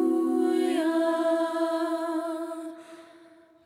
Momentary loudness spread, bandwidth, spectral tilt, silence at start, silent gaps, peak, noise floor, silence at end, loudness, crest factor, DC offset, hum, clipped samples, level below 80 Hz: 12 LU; 15 kHz; -3.5 dB/octave; 0 s; none; -14 dBFS; -54 dBFS; 0.5 s; -27 LUFS; 14 dB; under 0.1%; none; under 0.1%; -88 dBFS